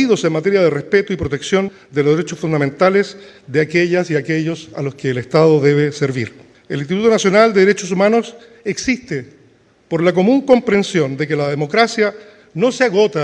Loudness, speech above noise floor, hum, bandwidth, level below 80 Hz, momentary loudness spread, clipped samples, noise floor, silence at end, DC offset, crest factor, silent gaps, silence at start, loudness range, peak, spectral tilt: -16 LUFS; 36 dB; none; 10.5 kHz; -52 dBFS; 12 LU; under 0.1%; -51 dBFS; 0 s; under 0.1%; 16 dB; none; 0 s; 2 LU; 0 dBFS; -5.5 dB/octave